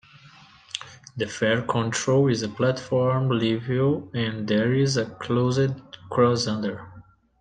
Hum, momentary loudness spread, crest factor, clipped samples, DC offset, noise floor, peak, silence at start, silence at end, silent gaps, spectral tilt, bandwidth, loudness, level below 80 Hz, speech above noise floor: none; 13 LU; 18 dB; under 0.1%; under 0.1%; -51 dBFS; -6 dBFS; 0.25 s; 0.4 s; none; -5.5 dB/octave; 9.6 kHz; -24 LUFS; -62 dBFS; 28 dB